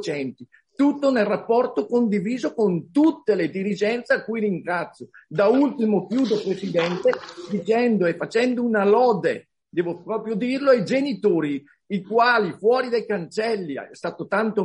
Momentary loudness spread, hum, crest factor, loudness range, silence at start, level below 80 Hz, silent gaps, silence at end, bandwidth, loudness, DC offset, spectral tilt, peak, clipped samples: 12 LU; none; 16 dB; 1 LU; 0 s; -70 dBFS; none; 0 s; 10 kHz; -22 LUFS; under 0.1%; -6.5 dB/octave; -6 dBFS; under 0.1%